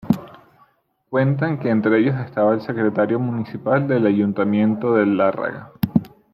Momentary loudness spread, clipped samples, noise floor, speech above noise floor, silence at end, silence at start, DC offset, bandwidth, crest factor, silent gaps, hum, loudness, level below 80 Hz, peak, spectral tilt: 7 LU; under 0.1%; -60 dBFS; 42 dB; 0.25 s; 0.05 s; under 0.1%; 15.5 kHz; 18 dB; none; none; -20 LUFS; -54 dBFS; -2 dBFS; -9.5 dB/octave